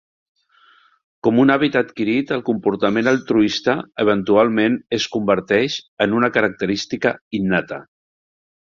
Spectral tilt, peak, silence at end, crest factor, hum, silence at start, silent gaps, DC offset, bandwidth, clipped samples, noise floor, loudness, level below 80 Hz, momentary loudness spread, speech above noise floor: -5.5 dB/octave; -2 dBFS; 0.85 s; 18 dB; none; 1.25 s; 5.88-5.97 s, 7.21-7.31 s; under 0.1%; 7.4 kHz; under 0.1%; -54 dBFS; -18 LUFS; -56 dBFS; 7 LU; 36 dB